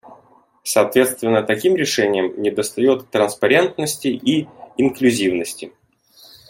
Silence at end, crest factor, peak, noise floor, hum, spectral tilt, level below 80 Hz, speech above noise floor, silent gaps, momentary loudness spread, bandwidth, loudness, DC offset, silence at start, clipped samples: 0.8 s; 16 dB; -2 dBFS; -52 dBFS; none; -4 dB/octave; -62 dBFS; 35 dB; none; 8 LU; 16.5 kHz; -18 LUFS; under 0.1%; 0.1 s; under 0.1%